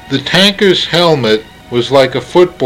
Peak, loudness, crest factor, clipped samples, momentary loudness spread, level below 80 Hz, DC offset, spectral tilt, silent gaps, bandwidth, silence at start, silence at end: 0 dBFS; -10 LUFS; 10 dB; 0.6%; 8 LU; -44 dBFS; under 0.1%; -5 dB/octave; none; 16 kHz; 0.05 s; 0 s